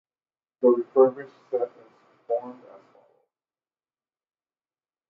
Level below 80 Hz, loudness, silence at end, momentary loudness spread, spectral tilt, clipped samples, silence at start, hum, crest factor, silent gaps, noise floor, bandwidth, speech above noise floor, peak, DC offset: -88 dBFS; -24 LUFS; 2.55 s; 15 LU; -9.5 dB/octave; under 0.1%; 0.6 s; none; 22 dB; none; under -90 dBFS; 3 kHz; over 68 dB; -6 dBFS; under 0.1%